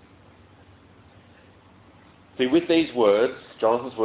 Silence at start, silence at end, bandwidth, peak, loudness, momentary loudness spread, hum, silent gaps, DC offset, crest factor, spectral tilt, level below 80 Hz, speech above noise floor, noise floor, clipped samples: 2.4 s; 0 s; 4 kHz; -6 dBFS; -22 LUFS; 7 LU; none; none; under 0.1%; 18 dB; -9.5 dB/octave; -60 dBFS; 31 dB; -52 dBFS; under 0.1%